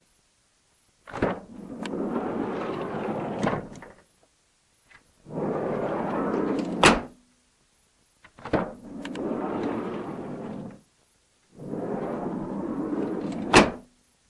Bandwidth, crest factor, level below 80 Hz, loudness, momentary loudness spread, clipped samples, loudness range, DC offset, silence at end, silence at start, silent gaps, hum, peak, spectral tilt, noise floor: 11.5 kHz; 30 dB; -50 dBFS; -27 LUFS; 20 LU; under 0.1%; 7 LU; under 0.1%; 0.45 s; 1.05 s; none; none; 0 dBFS; -4.5 dB/octave; -66 dBFS